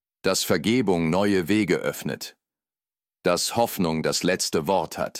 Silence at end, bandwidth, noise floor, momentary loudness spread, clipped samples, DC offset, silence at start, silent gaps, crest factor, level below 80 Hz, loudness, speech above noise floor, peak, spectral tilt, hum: 0 s; 17 kHz; under -90 dBFS; 7 LU; under 0.1%; under 0.1%; 0.25 s; none; 16 dB; -58 dBFS; -23 LUFS; over 67 dB; -10 dBFS; -4 dB/octave; none